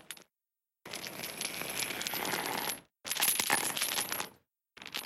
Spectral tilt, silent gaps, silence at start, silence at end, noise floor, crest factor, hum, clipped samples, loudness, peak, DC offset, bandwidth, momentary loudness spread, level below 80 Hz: -0.5 dB/octave; none; 0.1 s; 0 s; under -90 dBFS; 26 dB; none; under 0.1%; -33 LUFS; -10 dBFS; under 0.1%; 17 kHz; 15 LU; -74 dBFS